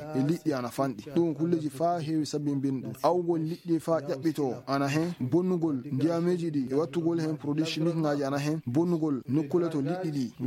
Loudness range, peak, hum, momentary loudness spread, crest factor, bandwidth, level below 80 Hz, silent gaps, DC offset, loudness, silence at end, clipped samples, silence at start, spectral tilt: 1 LU; -12 dBFS; none; 3 LU; 18 dB; 16 kHz; -70 dBFS; none; under 0.1%; -29 LUFS; 0 s; under 0.1%; 0 s; -7 dB/octave